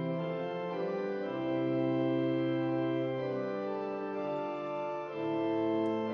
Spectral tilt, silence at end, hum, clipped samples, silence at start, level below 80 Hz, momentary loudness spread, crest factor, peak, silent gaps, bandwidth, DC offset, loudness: -6.5 dB/octave; 0 s; none; under 0.1%; 0 s; -76 dBFS; 6 LU; 12 dB; -20 dBFS; none; 6.4 kHz; under 0.1%; -34 LUFS